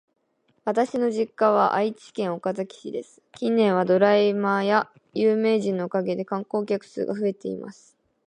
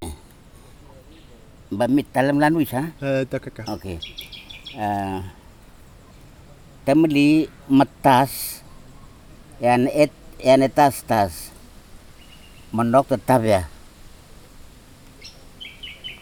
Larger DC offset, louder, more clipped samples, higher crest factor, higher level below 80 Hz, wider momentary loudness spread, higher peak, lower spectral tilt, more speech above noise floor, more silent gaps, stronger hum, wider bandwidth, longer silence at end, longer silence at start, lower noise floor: neither; second, -24 LUFS vs -20 LUFS; neither; about the same, 18 dB vs 20 dB; second, -74 dBFS vs -46 dBFS; second, 13 LU vs 20 LU; second, -6 dBFS vs -2 dBFS; about the same, -6.5 dB/octave vs -6 dB/octave; first, 45 dB vs 27 dB; neither; neither; second, 10 kHz vs over 20 kHz; first, 0.55 s vs 0.05 s; first, 0.65 s vs 0 s; first, -68 dBFS vs -46 dBFS